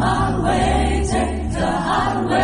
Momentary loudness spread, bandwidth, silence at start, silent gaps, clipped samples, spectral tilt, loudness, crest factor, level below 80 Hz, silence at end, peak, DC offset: 4 LU; 10.5 kHz; 0 s; none; under 0.1%; -5.5 dB/octave; -19 LUFS; 14 dB; -26 dBFS; 0 s; -6 dBFS; under 0.1%